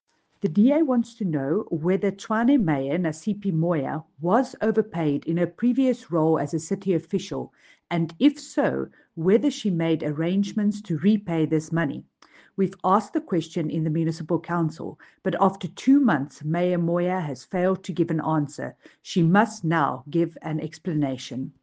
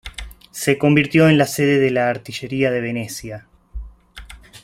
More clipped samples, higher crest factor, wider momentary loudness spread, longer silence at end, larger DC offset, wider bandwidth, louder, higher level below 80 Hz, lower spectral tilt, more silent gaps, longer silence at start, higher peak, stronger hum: neither; about the same, 18 dB vs 18 dB; second, 9 LU vs 24 LU; about the same, 0.15 s vs 0.05 s; neither; second, 9.4 kHz vs 16 kHz; second, -24 LUFS vs -17 LUFS; second, -64 dBFS vs -42 dBFS; first, -7 dB/octave vs -5.5 dB/octave; neither; first, 0.45 s vs 0.05 s; second, -6 dBFS vs -2 dBFS; neither